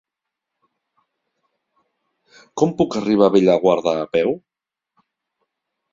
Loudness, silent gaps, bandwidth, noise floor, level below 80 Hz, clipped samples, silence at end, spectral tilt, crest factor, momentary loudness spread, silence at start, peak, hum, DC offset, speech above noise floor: -18 LUFS; none; 7.6 kHz; -83 dBFS; -60 dBFS; under 0.1%; 1.55 s; -6.5 dB/octave; 20 dB; 9 LU; 2.55 s; -2 dBFS; none; under 0.1%; 66 dB